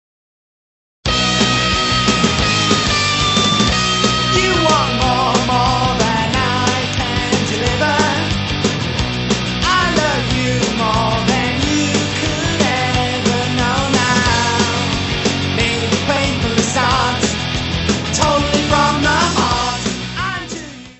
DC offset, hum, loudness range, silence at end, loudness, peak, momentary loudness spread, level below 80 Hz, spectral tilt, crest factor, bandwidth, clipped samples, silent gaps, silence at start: under 0.1%; none; 3 LU; 0.05 s; -15 LUFS; 0 dBFS; 4 LU; -30 dBFS; -4 dB/octave; 16 dB; 8.4 kHz; under 0.1%; none; 1.05 s